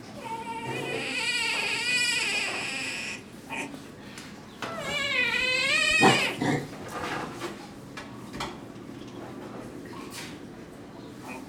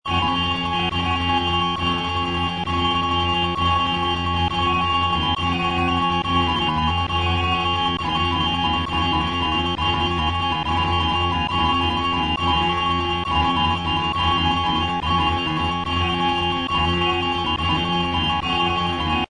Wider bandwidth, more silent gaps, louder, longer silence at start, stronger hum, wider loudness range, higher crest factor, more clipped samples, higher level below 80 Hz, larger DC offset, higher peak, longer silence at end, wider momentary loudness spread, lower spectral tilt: first, over 20 kHz vs 10 kHz; neither; second, -27 LUFS vs -20 LUFS; about the same, 0 s vs 0.05 s; neither; first, 15 LU vs 1 LU; first, 24 dB vs 14 dB; neither; second, -60 dBFS vs -36 dBFS; neither; about the same, -6 dBFS vs -6 dBFS; about the same, 0 s vs 0.05 s; first, 20 LU vs 2 LU; second, -2.5 dB/octave vs -5.5 dB/octave